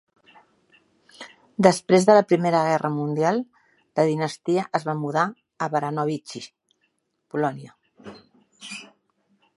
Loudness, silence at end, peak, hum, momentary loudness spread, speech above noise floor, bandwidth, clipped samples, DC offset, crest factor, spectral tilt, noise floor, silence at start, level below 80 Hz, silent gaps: -22 LUFS; 0.7 s; 0 dBFS; none; 24 LU; 51 dB; 11.5 kHz; under 0.1%; under 0.1%; 24 dB; -6 dB/octave; -72 dBFS; 1.2 s; -72 dBFS; none